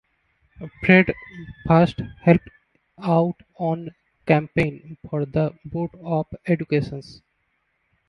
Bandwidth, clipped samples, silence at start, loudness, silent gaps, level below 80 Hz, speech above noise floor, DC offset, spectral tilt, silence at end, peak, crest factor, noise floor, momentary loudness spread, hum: 6.2 kHz; under 0.1%; 0.6 s; -22 LUFS; none; -48 dBFS; 49 dB; under 0.1%; -9 dB/octave; 0.95 s; 0 dBFS; 22 dB; -71 dBFS; 19 LU; none